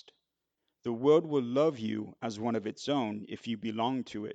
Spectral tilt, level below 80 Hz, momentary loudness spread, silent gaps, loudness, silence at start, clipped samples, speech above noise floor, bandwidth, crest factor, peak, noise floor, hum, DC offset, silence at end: -6.5 dB/octave; -78 dBFS; 12 LU; none; -32 LUFS; 0.85 s; under 0.1%; 54 dB; 8.2 kHz; 18 dB; -14 dBFS; -85 dBFS; none; under 0.1%; 0 s